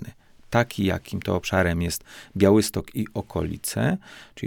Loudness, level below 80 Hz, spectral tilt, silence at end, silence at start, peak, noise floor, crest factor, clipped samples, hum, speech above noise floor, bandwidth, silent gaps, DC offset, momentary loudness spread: -24 LUFS; -46 dBFS; -5.5 dB/octave; 0 s; 0 s; -4 dBFS; -44 dBFS; 20 dB; under 0.1%; none; 20 dB; 19 kHz; none; under 0.1%; 13 LU